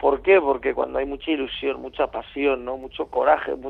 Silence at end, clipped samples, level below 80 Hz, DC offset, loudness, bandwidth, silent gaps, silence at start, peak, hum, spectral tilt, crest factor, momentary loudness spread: 0 s; under 0.1%; -48 dBFS; under 0.1%; -23 LUFS; 4.3 kHz; none; 0 s; -4 dBFS; none; -7 dB/octave; 18 dB; 10 LU